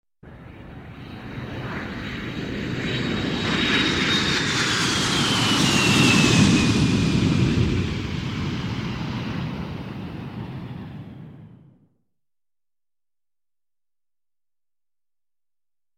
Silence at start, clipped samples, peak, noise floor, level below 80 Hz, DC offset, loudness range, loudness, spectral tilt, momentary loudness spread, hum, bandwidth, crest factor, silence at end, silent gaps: 0.25 s; under 0.1%; -4 dBFS; under -90 dBFS; -42 dBFS; under 0.1%; 18 LU; -21 LUFS; -4 dB/octave; 20 LU; none; 16 kHz; 20 dB; 4.5 s; none